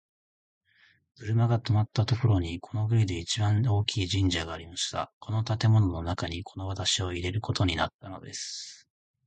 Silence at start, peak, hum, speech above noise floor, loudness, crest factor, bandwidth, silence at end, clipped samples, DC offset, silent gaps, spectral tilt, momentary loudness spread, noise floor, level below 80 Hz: 1.2 s; -10 dBFS; none; 37 dB; -28 LUFS; 18 dB; 9.2 kHz; 0.5 s; under 0.1%; under 0.1%; 5.13-5.21 s, 7.94-7.99 s; -5 dB/octave; 11 LU; -64 dBFS; -44 dBFS